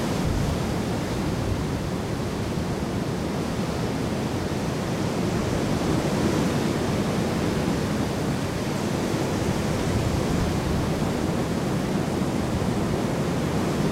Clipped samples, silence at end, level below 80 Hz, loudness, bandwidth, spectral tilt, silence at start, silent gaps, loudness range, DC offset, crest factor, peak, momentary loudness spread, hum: under 0.1%; 0 s; -38 dBFS; -26 LUFS; 16 kHz; -6 dB/octave; 0 s; none; 3 LU; under 0.1%; 14 dB; -10 dBFS; 3 LU; none